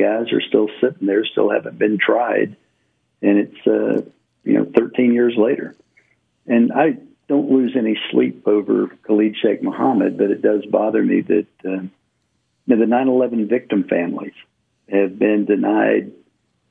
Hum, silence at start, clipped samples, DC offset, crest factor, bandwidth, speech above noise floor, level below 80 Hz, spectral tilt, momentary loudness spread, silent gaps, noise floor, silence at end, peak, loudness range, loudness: none; 0 s; under 0.1%; under 0.1%; 18 dB; 3.8 kHz; 51 dB; -70 dBFS; -9 dB/octave; 9 LU; none; -68 dBFS; 0.6 s; 0 dBFS; 2 LU; -18 LUFS